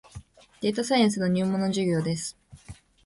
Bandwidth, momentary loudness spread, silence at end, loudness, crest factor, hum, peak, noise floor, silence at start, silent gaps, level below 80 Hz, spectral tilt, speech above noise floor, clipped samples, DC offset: 11.5 kHz; 8 LU; 0.3 s; -26 LUFS; 18 dB; none; -10 dBFS; -48 dBFS; 0.15 s; none; -58 dBFS; -5.5 dB/octave; 23 dB; under 0.1%; under 0.1%